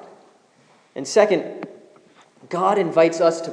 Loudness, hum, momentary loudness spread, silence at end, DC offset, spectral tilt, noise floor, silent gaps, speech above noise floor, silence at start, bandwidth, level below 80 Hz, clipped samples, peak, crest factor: -19 LUFS; none; 19 LU; 0 s; under 0.1%; -4.5 dB/octave; -56 dBFS; none; 38 dB; 0.95 s; 10.5 kHz; -86 dBFS; under 0.1%; -2 dBFS; 20 dB